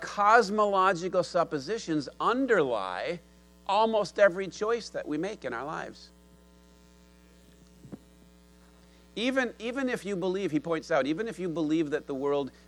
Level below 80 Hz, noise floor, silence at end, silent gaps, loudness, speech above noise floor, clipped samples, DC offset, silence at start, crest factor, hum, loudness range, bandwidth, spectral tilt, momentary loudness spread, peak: -62 dBFS; -57 dBFS; 0.15 s; none; -28 LUFS; 29 dB; under 0.1%; under 0.1%; 0 s; 22 dB; none; 12 LU; 12.5 kHz; -5 dB/octave; 12 LU; -8 dBFS